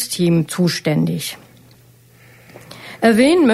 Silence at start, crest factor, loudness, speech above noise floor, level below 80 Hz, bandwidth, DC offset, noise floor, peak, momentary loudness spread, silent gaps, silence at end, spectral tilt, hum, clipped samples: 0 s; 16 dB; -17 LUFS; 33 dB; -56 dBFS; 14.5 kHz; under 0.1%; -48 dBFS; -2 dBFS; 24 LU; none; 0 s; -5.5 dB/octave; none; under 0.1%